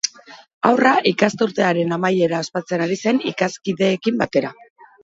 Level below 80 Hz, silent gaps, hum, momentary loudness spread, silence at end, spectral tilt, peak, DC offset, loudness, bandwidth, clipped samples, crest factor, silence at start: -62 dBFS; 0.54-0.61 s; none; 7 LU; 0.5 s; -4.5 dB/octave; 0 dBFS; under 0.1%; -19 LUFS; 8 kHz; under 0.1%; 18 dB; 0.05 s